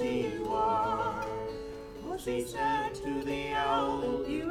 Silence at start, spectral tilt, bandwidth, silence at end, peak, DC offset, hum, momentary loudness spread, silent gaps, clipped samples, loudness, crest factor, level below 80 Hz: 0 s; -5 dB/octave; 16.5 kHz; 0 s; -16 dBFS; under 0.1%; none; 10 LU; none; under 0.1%; -32 LUFS; 16 dB; -52 dBFS